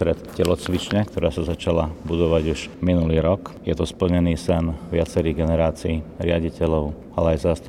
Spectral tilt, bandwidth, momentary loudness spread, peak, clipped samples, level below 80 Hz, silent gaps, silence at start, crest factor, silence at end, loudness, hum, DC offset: -7 dB/octave; 13.5 kHz; 5 LU; -4 dBFS; under 0.1%; -38 dBFS; none; 0 s; 16 dB; 0 s; -22 LUFS; none; under 0.1%